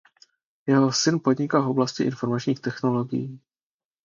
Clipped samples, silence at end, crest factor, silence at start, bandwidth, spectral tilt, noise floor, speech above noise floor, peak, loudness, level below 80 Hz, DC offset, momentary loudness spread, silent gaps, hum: under 0.1%; 0.65 s; 18 dB; 0.65 s; 7.6 kHz; -5.5 dB/octave; under -90 dBFS; over 67 dB; -6 dBFS; -24 LUFS; -68 dBFS; under 0.1%; 9 LU; none; none